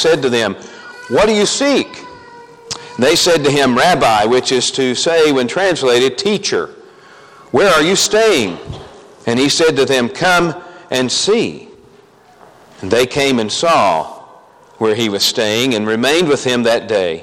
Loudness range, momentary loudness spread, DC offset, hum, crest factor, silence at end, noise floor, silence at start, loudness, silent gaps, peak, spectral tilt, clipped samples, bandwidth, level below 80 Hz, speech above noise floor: 4 LU; 15 LU; under 0.1%; none; 14 dB; 0 s; -45 dBFS; 0 s; -13 LUFS; none; 0 dBFS; -3 dB/octave; under 0.1%; 16.5 kHz; -48 dBFS; 32 dB